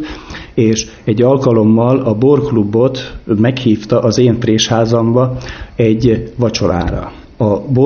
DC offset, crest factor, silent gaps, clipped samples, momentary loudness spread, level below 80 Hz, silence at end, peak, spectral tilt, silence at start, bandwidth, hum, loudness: under 0.1%; 12 dB; none; under 0.1%; 11 LU; -34 dBFS; 0 s; 0 dBFS; -6.5 dB/octave; 0 s; 7 kHz; none; -13 LUFS